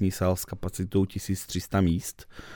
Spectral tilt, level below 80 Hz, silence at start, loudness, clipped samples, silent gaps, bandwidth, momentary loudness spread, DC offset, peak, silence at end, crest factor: -6 dB/octave; -48 dBFS; 0 s; -29 LUFS; under 0.1%; none; 19.5 kHz; 9 LU; under 0.1%; -10 dBFS; 0 s; 18 dB